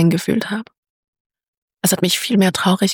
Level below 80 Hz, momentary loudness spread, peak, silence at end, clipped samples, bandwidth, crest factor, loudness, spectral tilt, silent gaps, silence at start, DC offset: -56 dBFS; 8 LU; -4 dBFS; 0 s; under 0.1%; 19 kHz; 16 dB; -17 LUFS; -4.5 dB/octave; 0.78-0.83 s, 0.90-1.13 s, 1.20-1.30 s, 1.48-1.68 s; 0 s; under 0.1%